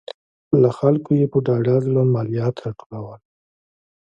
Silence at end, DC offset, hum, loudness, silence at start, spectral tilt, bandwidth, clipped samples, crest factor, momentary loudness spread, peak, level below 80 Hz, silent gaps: 0.9 s; under 0.1%; none; -19 LUFS; 0.1 s; -10 dB/octave; 7.6 kHz; under 0.1%; 18 dB; 17 LU; -2 dBFS; -58 dBFS; 0.14-0.51 s, 2.86-2.90 s